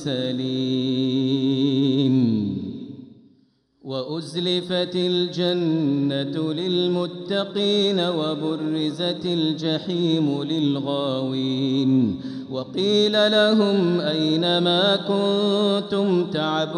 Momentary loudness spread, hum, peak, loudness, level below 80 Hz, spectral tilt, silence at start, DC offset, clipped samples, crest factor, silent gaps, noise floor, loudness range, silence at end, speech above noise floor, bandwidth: 7 LU; none; -6 dBFS; -22 LUFS; -66 dBFS; -6.5 dB/octave; 0 s; under 0.1%; under 0.1%; 14 dB; none; -61 dBFS; 5 LU; 0 s; 39 dB; 10 kHz